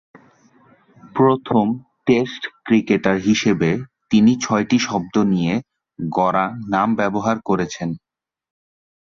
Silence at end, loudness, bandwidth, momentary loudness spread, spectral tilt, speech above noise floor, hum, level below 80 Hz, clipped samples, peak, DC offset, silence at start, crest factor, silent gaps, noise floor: 1.2 s; -19 LUFS; 7.4 kHz; 10 LU; -6 dB/octave; 36 dB; none; -54 dBFS; under 0.1%; -2 dBFS; under 0.1%; 1.05 s; 16 dB; none; -53 dBFS